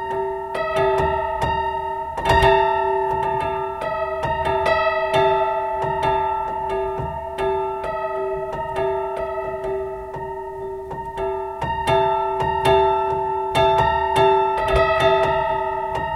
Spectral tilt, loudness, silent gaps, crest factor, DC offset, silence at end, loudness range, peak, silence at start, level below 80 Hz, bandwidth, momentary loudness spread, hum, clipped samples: -5.5 dB/octave; -21 LUFS; none; 16 dB; under 0.1%; 0 s; 7 LU; -4 dBFS; 0 s; -38 dBFS; 13.5 kHz; 10 LU; none; under 0.1%